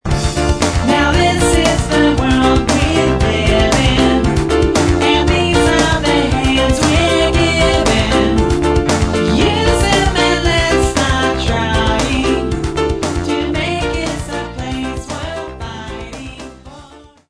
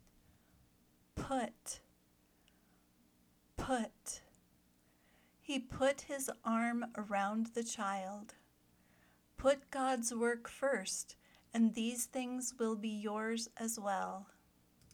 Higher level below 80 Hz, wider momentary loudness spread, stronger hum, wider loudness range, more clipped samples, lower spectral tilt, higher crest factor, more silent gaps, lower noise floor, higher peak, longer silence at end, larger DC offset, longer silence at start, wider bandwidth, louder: first, -22 dBFS vs -66 dBFS; about the same, 11 LU vs 13 LU; second, none vs 60 Hz at -80 dBFS; about the same, 7 LU vs 9 LU; neither; first, -5 dB/octave vs -3.5 dB/octave; second, 14 dB vs 20 dB; neither; second, -40 dBFS vs -72 dBFS; first, 0 dBFS vs -22 dBFS; second, 0.35 s vs 0.7 s; neither; second, 0.05 s vs 1.15 s; second, 11 kHz vs 20 kHz; first, -14 LUFS vs -39 LUFS